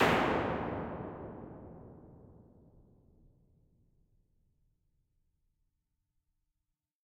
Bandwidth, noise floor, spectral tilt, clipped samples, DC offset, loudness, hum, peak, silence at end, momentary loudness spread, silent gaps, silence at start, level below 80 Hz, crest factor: 16 kHz; -87 dBFS; -5.5 dB/octave; under 0.1%; under 0.1%; -35 LUFS; none; -16 dBFS; 4.7 s; 26 LU; none; 0 s; -60 dBFS; 24 dB